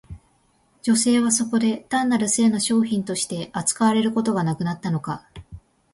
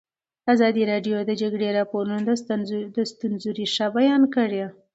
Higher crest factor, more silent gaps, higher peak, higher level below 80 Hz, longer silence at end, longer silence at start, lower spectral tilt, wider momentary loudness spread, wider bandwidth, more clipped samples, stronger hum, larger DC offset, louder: about the same, 16 dB vs 16 dB; neither; about the same, -6 dBFS vs -6 dBFS; first, -54 dBFS vs -72 dBFS; first, 0.35 s vs 0.2 s; second, 0.1 s vs 0.45 s; second, -4 dB/octave vs -5.5 dB/octave; about the same, 8 LU vs 9 LU; first, 11.5 kHz vs 8 kHz; neither; neither; neither; about the same, -21 LUFS vs -23 LUFS